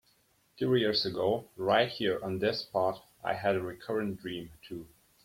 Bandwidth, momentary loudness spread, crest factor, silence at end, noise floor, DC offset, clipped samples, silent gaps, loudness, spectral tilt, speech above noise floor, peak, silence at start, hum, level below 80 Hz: 16.5 kHz; 14 LU; 20 dB; 0.4 s; -69 dBFS; under 0.1%; under 0.1%; none; -31 LUFS; -6 dB/octave; 38 dB; -12 dBFS; 0.6 s; none; -66 dBFS